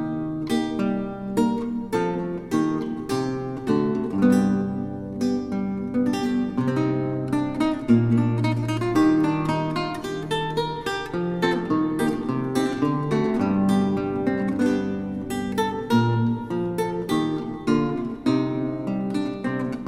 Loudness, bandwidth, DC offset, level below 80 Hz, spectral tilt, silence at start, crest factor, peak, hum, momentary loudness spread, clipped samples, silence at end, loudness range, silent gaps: -24 LUFS; 15 kHz; under 0.1%; -50 dBFS; -7 dB/octave; 0 s; 16 dB; -6 dBFS; none; 7 LU; under 0.1%; 0 s; 3 LU; none